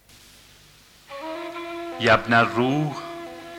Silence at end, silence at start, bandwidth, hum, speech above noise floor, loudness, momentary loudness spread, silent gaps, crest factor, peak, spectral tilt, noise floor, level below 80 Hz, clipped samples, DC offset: 0 s; 1.1 s; 17.5 kHz; 50 Hz at -55 dBFS; 32 dB; -22 LUFS; 19 LU; none; 20 dB; -4 dBFS; -5.5 dB/octave; -52 dBFS; -54 dBFS; under 0.1%; under 0.1%